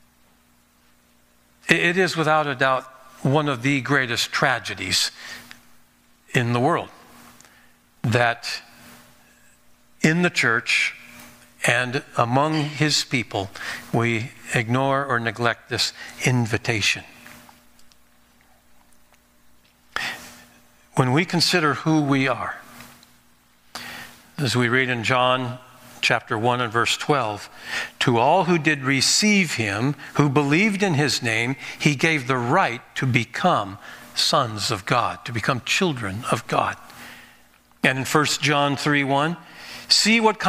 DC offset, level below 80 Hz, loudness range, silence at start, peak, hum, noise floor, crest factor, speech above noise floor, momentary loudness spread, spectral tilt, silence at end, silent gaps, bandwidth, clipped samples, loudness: under 0.1%; -62 dBFS; 6 LU; 1.65 s; 0 dBFS; none; -59 dBFS; 22 dB; 37 dB; 12 LU; -4 dB/octave; 0 s; none; 16 kHz; under 0.1%; -21 LUFS